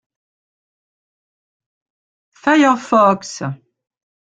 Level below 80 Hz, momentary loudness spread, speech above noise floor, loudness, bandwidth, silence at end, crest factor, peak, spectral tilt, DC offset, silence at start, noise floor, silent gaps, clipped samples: -64 dBFS; 14 LU; over 76 dB; -15 LUFS; 9.2 kHz; 0.85 s; 18 dB; -2 dBFS; -5 dB/octave; under 0.1%; 2.45 s; under -90 dBFS; none; under 0.1%